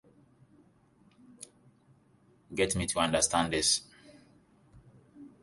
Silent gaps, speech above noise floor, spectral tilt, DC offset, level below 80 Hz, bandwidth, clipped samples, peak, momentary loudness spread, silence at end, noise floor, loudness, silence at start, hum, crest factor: none; 36 dB; -2.5 dB/octave; under 0.1%; -56 dBFS; 12 kHz; under 0.1%; -12 dBFS; 24 LU; 0.15 s; -65 dBFS; -28 LUFS; 1.4 s; none; 24 dB